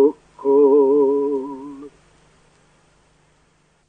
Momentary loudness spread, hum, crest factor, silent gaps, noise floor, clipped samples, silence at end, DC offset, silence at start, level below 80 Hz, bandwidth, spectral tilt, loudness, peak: 21 LU; 50 Hz at -60 dBFS; 16 dB; none; -60 dBFS; under 0.1%; 2 s; under 0.1%; 0 s; -64 dBFS; 3.2 kHz; -8.5 dB/octave; -17 LUFS; -4 dBFS